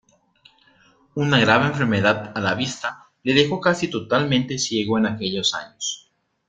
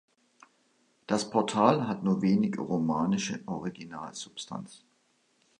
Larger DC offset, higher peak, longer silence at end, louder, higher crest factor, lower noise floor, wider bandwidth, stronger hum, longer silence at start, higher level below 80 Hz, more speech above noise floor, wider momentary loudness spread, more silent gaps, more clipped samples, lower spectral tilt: neither; first, -2 dBFS vs -6 dBFS; second, 0.5 s vs 0.85 s; first, -21 LUFS vs -29 LUFS; about the same, 22 dB vs 24 dB; second, -57 dBFS vs -70 dBFS; second, 9.4 kHz vs 11 kHz; neither; about the same, 1.15 s vs 1.1 s; first, -58 dBFS vs -68 dBFS; second, 36 dB vs 42 dB; second, 11 LU vs 16 LU; neither; neither; second, -4.5 dB/octave vs -6 dB/octave